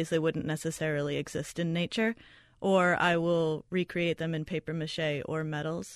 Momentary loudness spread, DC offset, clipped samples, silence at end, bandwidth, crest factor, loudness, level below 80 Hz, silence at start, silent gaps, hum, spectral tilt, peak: 9 LU; under 0.1%; under 0.1%; 0 s; 13.5 kHz; 18 dB; -30 LUFS; -62 dBFS; 0 s; none; none; -5.5 dB/octave; -12 dBFS